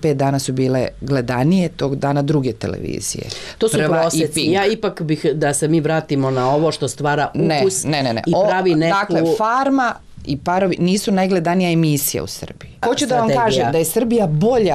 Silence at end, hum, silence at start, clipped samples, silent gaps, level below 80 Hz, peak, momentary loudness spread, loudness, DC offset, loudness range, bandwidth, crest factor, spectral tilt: 0 s; none; 0 s; under 0.1%; none; -46 dBFS; -8 dBFS; 8 LU; -17 LUFS; under 0.1%; 2 LU; 15 kHz; 10 dB; -5 dB/octave